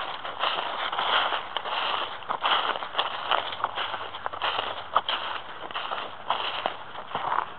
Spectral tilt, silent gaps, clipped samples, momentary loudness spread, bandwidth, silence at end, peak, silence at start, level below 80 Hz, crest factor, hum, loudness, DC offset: -4.5 dB/octave; none; under 0.1%; 9 LU; 6.4 kHz; 0 s; -4 dBFS; 0 s; -68 dBFS; 26 dB; none; -28 LUFS; 0.7%